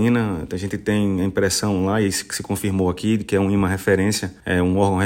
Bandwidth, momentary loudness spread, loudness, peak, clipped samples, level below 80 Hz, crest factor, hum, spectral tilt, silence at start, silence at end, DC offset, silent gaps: 16.5 kHz; 6 LU; -21 LUFS; -6 dBFS; under 0.1%; -46 dBFS; 14 dB; none; -5.5 dB/octave; 0 s; 0 s; under 0.1%; none